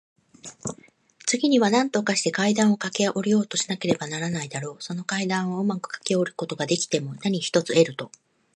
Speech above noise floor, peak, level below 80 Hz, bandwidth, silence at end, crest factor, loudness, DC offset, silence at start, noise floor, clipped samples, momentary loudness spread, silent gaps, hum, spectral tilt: 30 dB; -6 dBFS; -68 dBFS; 11.5 kHz; 0.5 s; 20 dB; -24 LUFS; under 0.1%; 0.45 s; -54 dBFS; under 0.1%; 13 LU; none; none; -4 dB/octave